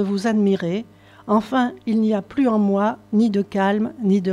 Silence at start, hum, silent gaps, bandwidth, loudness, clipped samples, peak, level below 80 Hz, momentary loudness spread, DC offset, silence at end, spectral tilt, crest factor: 0 s; none; none; 10.5 kHz; -20 LUFS; under 0.1%; -8 dBFS; -60 dBFS; 4 LU; under 0.1%; 0 s; -7.5 dB/octave; 12 dB